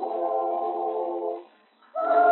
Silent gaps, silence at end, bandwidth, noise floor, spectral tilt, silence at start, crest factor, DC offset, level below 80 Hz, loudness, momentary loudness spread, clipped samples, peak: none; 0 s; 4.2 kHz; -57 dBFS; -1.5 dB/octave; 0 s; 16 dB; under 0.1%; under -90 dBFS; -27 LUFS; 11 LU; under 0.1%; -10 dBFS